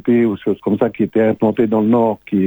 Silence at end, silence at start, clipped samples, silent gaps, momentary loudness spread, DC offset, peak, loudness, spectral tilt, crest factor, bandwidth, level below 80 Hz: 0 s; 0.05 s; under 0.1%; none; 4 LU; under 0.1%; -2 dBFS; -16 LUFS; -10 dB/octave; 12 dB; over 20 kHz; -54 dBFS